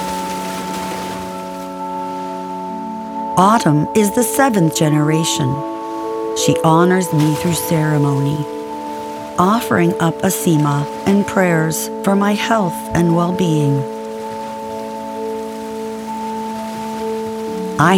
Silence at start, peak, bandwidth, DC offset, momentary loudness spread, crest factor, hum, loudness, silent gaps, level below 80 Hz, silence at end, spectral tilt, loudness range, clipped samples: 0 s; 0 dBFS; 18 kHz; under 0.1%; 12 LU; 16 dB; none; -17 LUFS; none; -50 dBFS; 0 s; -5.5 dB/octave; 9 LU; under 0.1%